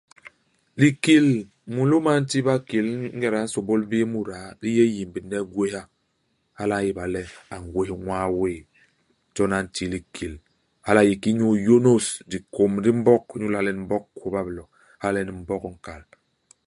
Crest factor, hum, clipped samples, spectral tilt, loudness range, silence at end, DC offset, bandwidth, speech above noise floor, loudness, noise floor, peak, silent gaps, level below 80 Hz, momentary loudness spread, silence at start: 22 dB; none; under 0.1%; -6 dB/octave; 8 LU; 0.65 s; under 0.1%; 11.5 kHz; 49 dB; -23 LUFS; -71 dBFS; -2 dBFS; none; -52 dBFS; 16 LU; 0.25 s